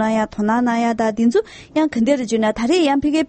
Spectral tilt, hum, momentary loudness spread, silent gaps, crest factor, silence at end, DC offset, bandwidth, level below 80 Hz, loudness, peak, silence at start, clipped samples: -5 dB/octave; none; 4 LU; none; 12 dB; 0.05 s; under 0.1%; 8.8 kHz; -48 dBFS; -18 LUFS; -4 dBFS; 0 s; under 0.1%